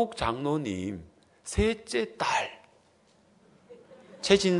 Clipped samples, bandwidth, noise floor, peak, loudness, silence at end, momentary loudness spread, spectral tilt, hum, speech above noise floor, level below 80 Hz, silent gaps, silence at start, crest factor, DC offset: under 0.1%; 11 kHz; -63 dBFS; -6 dBFS; -29 LUFS; 0 s; 12 LU; -4.5 dB/octave; none; 36 dB; -48 dBFS; none; 0 s; 24 dB; under 0.1%